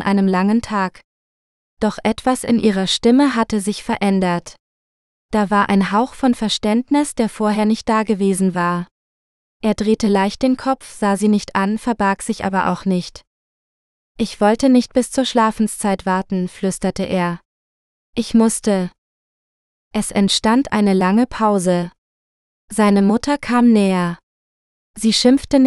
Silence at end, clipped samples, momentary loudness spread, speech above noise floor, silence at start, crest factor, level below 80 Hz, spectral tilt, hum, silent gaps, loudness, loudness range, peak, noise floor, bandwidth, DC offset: 0 s; under 0.1%; 9 LU; over 74 dB; 0 s; 16 dB; -46 dBFS; -5 dB/octave; none; 1.04-1.77 s, 4.60-5.29 s, 8.91-9.60 s, 13.27-14.15 s, 17.45-18.13 s, 18.98-19.91 s, 21.98-22.68 s, 24.23-24.94 s; -17 LUFS; 3 LU; 0 dBFS; under -90 dBFS; 12.5 kHz; under 0.1%